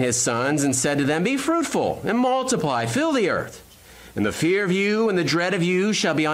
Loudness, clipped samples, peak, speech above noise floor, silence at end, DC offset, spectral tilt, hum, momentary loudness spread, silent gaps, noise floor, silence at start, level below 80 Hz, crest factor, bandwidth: -21 LUFS; under 0.1%; -10 dBFS; 25 dB; 0 s; under 0.1%; -4 dB/octave; none; 4 LU; none; -46 dBFS; 0 s; -54 dBFS; 10 dB; 16 kHz